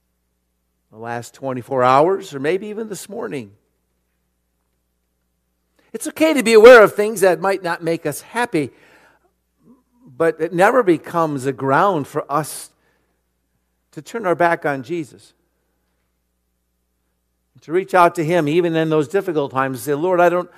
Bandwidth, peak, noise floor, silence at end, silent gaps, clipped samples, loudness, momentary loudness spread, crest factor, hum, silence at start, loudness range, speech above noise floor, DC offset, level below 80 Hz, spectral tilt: 15 kHz; 0 dBFS; -69 dBFS; 0.15 s; none; 0.2%; -16 LUFS; 15 LU; 18 dB; none; 0.95 s; 13 LU; 53 dB; under 0.1%; -60 dBFS; -5 dB/octave